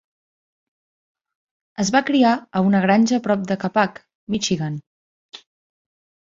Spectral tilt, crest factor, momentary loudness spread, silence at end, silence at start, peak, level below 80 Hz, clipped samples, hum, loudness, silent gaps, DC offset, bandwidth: -5 dB/octave; 20 dB; 11 LU; 0.9 s; 1.8 s; -2 dBFS; -60 dBFS; under 0.1%; none; -19 LUFS; 4.15-4.27 s, 4.87-5.29 s; under 0.1%; 7.8 kHz